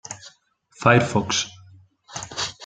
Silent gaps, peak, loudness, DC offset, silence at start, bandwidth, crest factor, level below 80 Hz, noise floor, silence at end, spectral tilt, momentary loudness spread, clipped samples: none; -2 dBFS; -21 LUFS; under 0.1%; 0.1 s; 9.4 kHz; 22 dB; -56 dBFS; -57 dBFS; 0 s; -4 dB/octave; 20 LU; under 0.1%